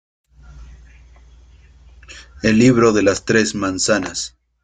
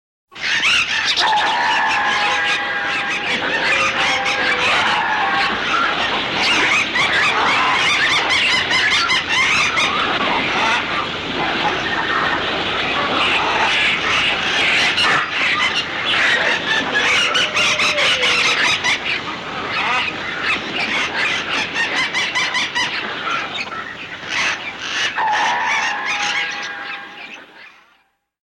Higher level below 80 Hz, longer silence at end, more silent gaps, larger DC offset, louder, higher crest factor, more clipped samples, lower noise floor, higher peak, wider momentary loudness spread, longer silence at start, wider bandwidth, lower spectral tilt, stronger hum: first, -44 dBFS vs -50 dBFS; second, 0.35 s vs 0.85 s; neither; neither; about the same, -16 LUFS vs -16 LUFS; first, 18 dB vs 12 dB; neither; second, -46 dBFS vs -60 dBFS; first, -2 dBFS vs -6 dBFS; first, 16 LU vs 8 LU; first, 0.5 s vs 0.3 s; second, 9.6 kHz vs 16.5 kHz; first, -4.5 dB/octave vs -1.5 dB/octave; neither